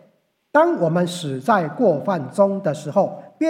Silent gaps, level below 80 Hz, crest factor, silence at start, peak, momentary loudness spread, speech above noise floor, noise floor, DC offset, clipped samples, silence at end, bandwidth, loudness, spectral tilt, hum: none; -72 dBFS; 18 dB; 0.55 s; -2 dBFS; 7 LU; 42 dB; -61 dBFS; under 0.1%; under 0.1%; 0 s; 15 kHz; -20 LUFS; -6.5 dB/octave; none